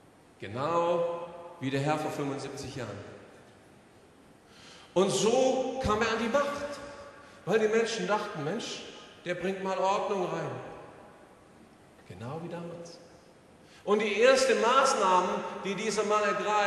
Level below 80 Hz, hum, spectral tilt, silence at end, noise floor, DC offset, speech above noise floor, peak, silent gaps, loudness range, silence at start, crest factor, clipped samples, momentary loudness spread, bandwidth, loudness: -60 dBFS; none; -4 dB/octave; 0 s; -57 dBFS; under 0.1%; 28 dB; -10 dBFS; none; 10 LU; 0.4 s; 20 dB; under 0.1%; 21 LU; 13 kHz; -29 LUFS